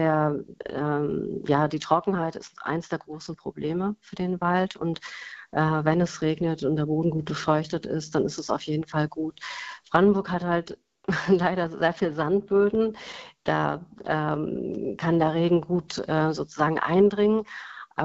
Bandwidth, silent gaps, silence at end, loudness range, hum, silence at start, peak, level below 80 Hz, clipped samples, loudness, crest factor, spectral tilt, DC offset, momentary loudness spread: 8 kHz; none; 0 s; 4 LU; none; 0 s; -4 dBFS; -58 dBFS; under 0.1%; -26 LUFS; 22 dB; -7 dB/octave; under 0.1%; 13 LU